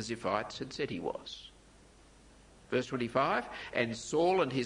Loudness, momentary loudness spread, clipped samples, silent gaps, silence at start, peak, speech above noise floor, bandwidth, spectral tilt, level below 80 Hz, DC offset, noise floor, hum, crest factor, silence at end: -34 LUFS; 13 LU; under 0.1%; none; 0 s; -14 dBFS; 26 dB; 11 kHz; -5 dB/octave; -62 dBFS; under 0.1%; -59 dBFS; none; 20 dB; 0 s